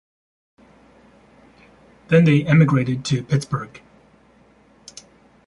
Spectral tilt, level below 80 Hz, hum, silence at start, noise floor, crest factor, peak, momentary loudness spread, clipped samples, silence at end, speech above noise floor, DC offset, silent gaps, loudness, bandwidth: -7 dB/octave; -56 dBFS; none; 2.1 s; -54 dBFS; 18 dB; -4 dBFS; 26 LU; under 0.1%; 1.8 s; 37 dB; under 0.1%; none; -18 LUFS; 11.5 kHz